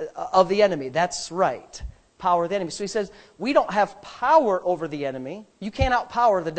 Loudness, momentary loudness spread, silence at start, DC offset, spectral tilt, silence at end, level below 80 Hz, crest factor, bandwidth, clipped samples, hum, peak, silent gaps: -23 LUFS; 16 LU; 0 s; under 0.1%; -4.5 dB/octave; 0 s; -42 dBFS; 20 dB; 9 kHz; under 0.1%; none; -4 dBFS; none